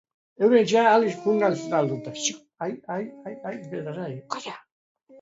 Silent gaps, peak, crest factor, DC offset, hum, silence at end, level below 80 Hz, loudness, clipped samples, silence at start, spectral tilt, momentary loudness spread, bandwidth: 4.72-4.95 s; -6 dBFS; 18 dB; under 0.1%; none; 0.05 s; -74 dBFS; -24 LUFS; under 0.1%; 0.4 s; -4.5 dB/octave; 17 LU; 8 kHz